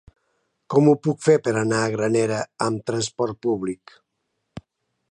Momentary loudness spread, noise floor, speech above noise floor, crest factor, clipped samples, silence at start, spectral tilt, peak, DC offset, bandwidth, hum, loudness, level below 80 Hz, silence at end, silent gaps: 8 LU; -76 dBFS; 55 dB; 18 dB; under 0.1%; 0.7 s; -6 dB/octave; -4 dBFS; under 0.1%; 11 kHz; none; -22 LUFS; -60 dBFS; 1.35 s; none